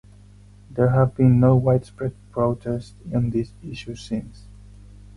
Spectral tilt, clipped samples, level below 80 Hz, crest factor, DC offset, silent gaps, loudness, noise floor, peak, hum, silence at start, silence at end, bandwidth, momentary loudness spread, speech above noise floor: -9 dB/octave; under 0.1%; -44 dBFS; 16 dB; under 0.1%; none; -21 LUFS; -47 dBFS; -6 dBFS; 50 Hz at -40 dBFS; 0.7 s; 0.8 s; 10.5 kHz; 17 LU; 26 dB